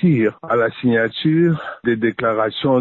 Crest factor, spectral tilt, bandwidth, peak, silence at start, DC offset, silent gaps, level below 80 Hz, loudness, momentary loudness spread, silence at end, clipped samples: 10 dB; -9.5 dB/octave; 4.3 kHz; -6 dBFS; 0 s; under 0.1%; none; -56 dBFS; -18 LUFS; 3 LU; 0 s; under 0.1%